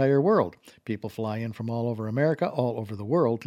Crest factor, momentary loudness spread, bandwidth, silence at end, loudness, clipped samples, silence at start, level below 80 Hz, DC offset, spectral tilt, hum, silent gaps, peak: 16 dB; 11 LU; 15 kHz; 0 s; -27 LUFS; under 0.1%; 0 s; -68 dBFS; under 0.1%; -9 dB/octave; none; none; -10 dBFS